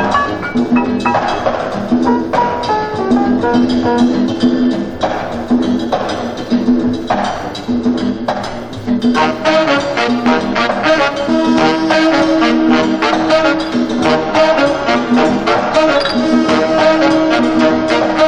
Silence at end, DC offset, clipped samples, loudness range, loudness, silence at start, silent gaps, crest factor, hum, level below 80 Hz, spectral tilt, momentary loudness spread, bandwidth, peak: 0 s; under 0.1%; under 0.1%; 4 LU; -13 LUFS; 0 s; none; 12 dB; none; -38 dBFS; -5.5 dB/octave; 6 LU; 9.8 kHz; 0 dBFS